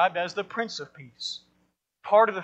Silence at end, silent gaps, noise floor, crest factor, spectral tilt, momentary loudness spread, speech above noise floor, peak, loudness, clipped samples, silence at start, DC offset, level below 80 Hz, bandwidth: 0 s; none; -71 dBFS; 20 dB; -3.5 dB/octave; 20 LU; 46 dB; -8 dBFS; -27 LUFS; under 0.1%; 0 s; under 0.1%; -78 dBFS; 8.4 kHz